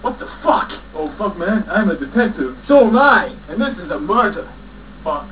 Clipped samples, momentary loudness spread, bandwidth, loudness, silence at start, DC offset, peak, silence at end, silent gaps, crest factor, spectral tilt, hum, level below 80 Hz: under 0.1%; 15 LU; 4 kHz; -17 LUFS; 0 s; 0.5%; 0 dBFS; 0 s; none; 16 dB; -9.5 dB/octave; none; -40 dBFS